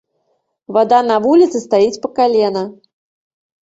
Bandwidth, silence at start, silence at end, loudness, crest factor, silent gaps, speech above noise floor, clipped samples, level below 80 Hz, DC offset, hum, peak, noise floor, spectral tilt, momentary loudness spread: 8 kHz; 0.7 s; 1 s; -14 LUFS; 14 dB; none; 53 dB; under 0.1%; -62 dBFS; under 0.1%; none; -2 dBFS; -66 dBFS; -5.5 dB/octave; 7 LU